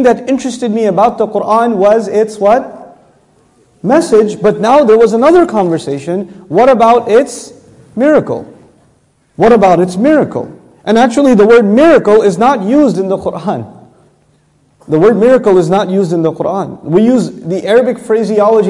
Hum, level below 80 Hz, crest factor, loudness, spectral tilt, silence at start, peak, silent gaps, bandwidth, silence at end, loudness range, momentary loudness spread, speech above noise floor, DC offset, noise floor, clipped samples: none; -46 dBFS; 10 dB; -10 LUFS; -6.5 dB/octave; 0 s; 0 dBFS; none; 11.5 kHz; 0 s; 4 LU; 12 LU; 43 dB; under 0.1%; -52 dBFS; under 0.1%